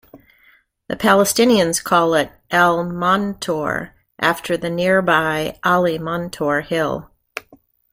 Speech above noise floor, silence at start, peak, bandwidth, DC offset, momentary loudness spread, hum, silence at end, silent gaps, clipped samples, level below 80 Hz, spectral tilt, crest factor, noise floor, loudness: 38 dB; 0.15 s; -2 dBFS; 16.5 kHz; under 0.1%; 13 LU; none; 0.9 s; none; under 0.1%; -52 dBFS; -4 dB/octave; 18 dB; -55 dBFS; -18 LUFS